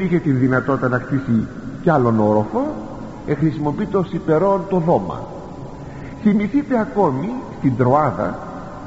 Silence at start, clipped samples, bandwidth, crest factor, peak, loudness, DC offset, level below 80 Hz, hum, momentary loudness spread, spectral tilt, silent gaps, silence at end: 0 s; under 0.1%; 8 kHz; 16 dB; -2 dBFS; -19 LUFS; under 0.1%; -44 dBFS; none; 16 LU; -8.5 dB/octave; none; 0 s